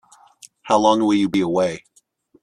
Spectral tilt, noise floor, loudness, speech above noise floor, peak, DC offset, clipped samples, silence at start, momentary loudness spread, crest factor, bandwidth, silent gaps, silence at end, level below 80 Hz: -5.5 dB/octave; -58 dBFS; -18 LUFS; 40 dB; -2 dBFS; under 0.1%; under 0.1%; 0.65 s; 7 LU; 18 dB; 11 kHz; none; 0.65 s; -60 dBFS